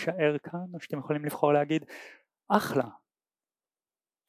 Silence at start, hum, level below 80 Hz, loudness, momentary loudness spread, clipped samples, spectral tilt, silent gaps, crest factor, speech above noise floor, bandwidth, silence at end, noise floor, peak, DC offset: 0 s; none; -74 dBFS; -29 LUFS; 13 LU; under 0.1%; -6.5 dB/octave; none; 24 dB; over 61 dB; 16 kHz; 1.3 s; under -90 dBFS; -6 dBFS; under 0.1%